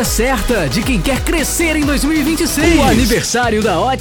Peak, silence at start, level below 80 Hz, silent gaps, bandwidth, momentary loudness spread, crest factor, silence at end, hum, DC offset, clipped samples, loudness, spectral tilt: 0 dBFS; 0 s; -22 dBFS; none; over 20 kHz; 4 LU; 14 dB; 0 s; none; under 0.1%; under 0.1%; -14 LUFS; -4 dB/octave